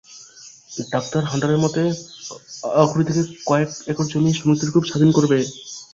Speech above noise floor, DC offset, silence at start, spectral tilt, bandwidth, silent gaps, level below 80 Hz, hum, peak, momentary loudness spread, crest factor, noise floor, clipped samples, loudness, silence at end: 25 dB; under 0.1%; 0.1 s; -6 dB/octave; 7.8 kHz; none; -56 dBFS; none; -2 dBFS; 17 LU; 18 dB; -44 dBFS; under 0.1%; -20 LUFS; 0.1 s